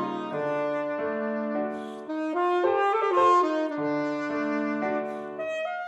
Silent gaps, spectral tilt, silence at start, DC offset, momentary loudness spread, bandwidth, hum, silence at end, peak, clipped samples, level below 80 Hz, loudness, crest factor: none; -6 dB/octave; 0 s; under 0.1%; 11 LU; 9 kHz; none; 0 s; -10 dBFS; under 0.1%; -84 dBFS; -27 LUFS; 16 dB